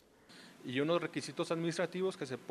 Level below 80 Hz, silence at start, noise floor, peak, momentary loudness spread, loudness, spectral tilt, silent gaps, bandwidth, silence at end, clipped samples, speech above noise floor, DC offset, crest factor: -82 dBFS; 0.3 s; -59 dBFS; -20 dBFS; 16 LU; -37 LUFS; -5 dB/octave; none; 13.5 kHz; 0 s; under 0.1%; 22 dB; under 0.1%; 18 dB